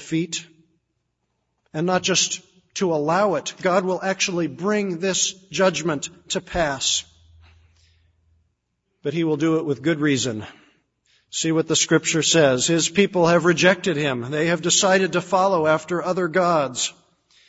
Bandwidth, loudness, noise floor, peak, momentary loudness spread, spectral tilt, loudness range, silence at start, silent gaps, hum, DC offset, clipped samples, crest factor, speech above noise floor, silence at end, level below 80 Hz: 8 kHz; -20 LUFS; -74 dBFS; -2 dBFS; 10 LU; -3.5 dB/octave; 7 LU; 0 s; none; none; under 0.1%; under 0.1%; 20 dB; 53 dB; 0.55 s; -54 dBFS